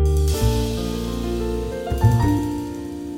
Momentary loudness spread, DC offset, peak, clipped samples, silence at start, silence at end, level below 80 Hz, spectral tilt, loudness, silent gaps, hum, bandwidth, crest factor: 9 LU; under 0.1%; -4 dBFS; under 0.1%; 0 s; 0 s; -26 dBFS; -6.5 dB/octave; -22 LUFS; none; none; 17 kHz; 16 dB